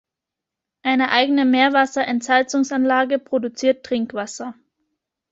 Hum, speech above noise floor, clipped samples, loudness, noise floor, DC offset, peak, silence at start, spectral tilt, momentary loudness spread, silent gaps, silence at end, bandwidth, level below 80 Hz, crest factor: none; 66 dB; under 0.1%; -19 LUFS; -85 dBFS; under 0.1%; -2 dBFS; 0.85 s; -3 dB/octave; 11 LU; none; 0.8 s; 8 kHz; -66 dBFS; 18 dB